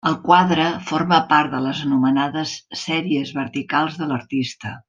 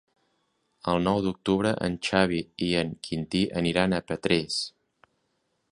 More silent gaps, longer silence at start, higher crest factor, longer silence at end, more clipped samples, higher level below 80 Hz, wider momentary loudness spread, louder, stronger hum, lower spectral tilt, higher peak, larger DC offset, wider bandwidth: neither; second, 0.05 s vs 0.85 s; second, 18 dB vs 24 dB; second, 0.1 s vs 1.05 s; neither; second, -62 dBFS vs -52 dBFS; first, 11 LU vs 6 LU; first, -20 LUFS vs -27 LUFS; neither; about the same, -5.5 dB/octave vs -5.5 dB/octave; about the same, -2 dBFS vs -4 dBFS; neither; second, 9 kHz vs 11 kHz